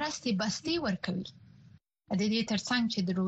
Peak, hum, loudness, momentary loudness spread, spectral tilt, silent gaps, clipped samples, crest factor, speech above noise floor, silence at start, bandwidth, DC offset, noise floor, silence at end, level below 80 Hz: -16 dBFS; none; -31 LUFS; 7 LU; -4.5 dB/octave; none; under 0.1%; 16 dB; 28 dB; 0 s; 8.4 kHz; under 0.1%; -59 dBFS; 0 s; -64 dBFS